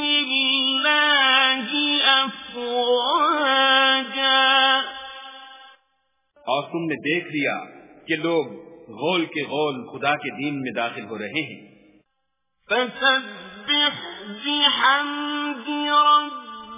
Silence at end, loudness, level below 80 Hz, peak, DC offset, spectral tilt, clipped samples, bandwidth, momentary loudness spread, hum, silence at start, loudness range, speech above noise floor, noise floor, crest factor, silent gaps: 0 s; -20 LUFS; -68 dBFS; -4 dBFS; under 0.1%; -7 dB/octave; under 0.1%; 3.9 kHz; 16 LU; none; 0 s; 9 LU; 54 dB; -77 dBFS; 18 dB; none